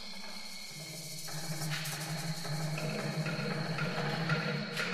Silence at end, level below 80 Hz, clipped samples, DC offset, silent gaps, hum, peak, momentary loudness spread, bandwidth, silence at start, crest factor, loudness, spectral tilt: 0 s; -70 dBFS; under 0.1%; under 0.1%; none; none; -18 dBFS; 10 LU; 16 kHz; 0 s; 18 dB; -36 LUFS; -4 dB/octave